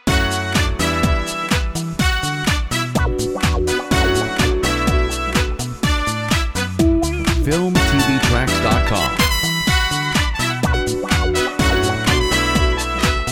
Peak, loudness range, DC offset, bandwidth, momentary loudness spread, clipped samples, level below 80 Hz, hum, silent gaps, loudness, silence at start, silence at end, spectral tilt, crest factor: 0 dBFS; 2 LU; under 0.1%; over 20 kHz; 4 LU; under 0.1%; -24 dBFS; none; none; -17 LUFS; 0.05 s; 0 s; -4.5 dB/octave; 18 dB